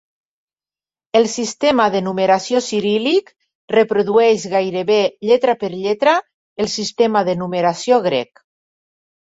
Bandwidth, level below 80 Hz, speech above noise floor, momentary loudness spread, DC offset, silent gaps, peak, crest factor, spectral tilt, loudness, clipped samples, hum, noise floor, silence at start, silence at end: 8 kHz; -62 dBFS; over 74 dB; 6 LU; under 0.1%; 3.55-3.68 s, 6.34-6.56 s; -2 dBFS; 16 dB; -4.5 dB/octave; -17 LUFS; under 0.1%; none; under -90 dBFS; 1.15 s; 1.05 s